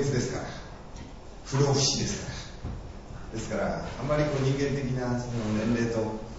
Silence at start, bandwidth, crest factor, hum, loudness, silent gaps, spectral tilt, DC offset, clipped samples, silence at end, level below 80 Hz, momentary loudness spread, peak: 0 s; 8 kHz; 18 dB; none; -29 LUFS; none; -5 dB/octave; under 0.1%; under 0.1%; 0 s; -44 dBFS; 18 LU; -12 dBFS